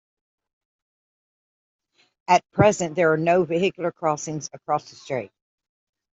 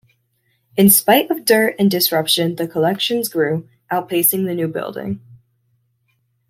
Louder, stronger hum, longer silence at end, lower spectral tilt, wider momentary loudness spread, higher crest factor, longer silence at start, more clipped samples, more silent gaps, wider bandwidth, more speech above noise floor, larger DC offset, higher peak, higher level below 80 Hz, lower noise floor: second, -23 LUFS vs -16 LUFS; neither; second, 0.95 s vs 1.15 s; first, -5.5 dB/octave vs -3.5 dB/octave; about the same, 12 LU vs 14 LU; about the same, 22 dB vs 18 dB; first, 2.3 s vs 0.75 s; neither; neither; second, 8.2 kHz vs 16.5 kHz; first, over 68 dB vs 49 dB; neither; second, -4 dBFS vs 0 dBFS; about the same, -60 dBFS vs -60 dBFS; first, under -90 dBFS vs -66 dBFS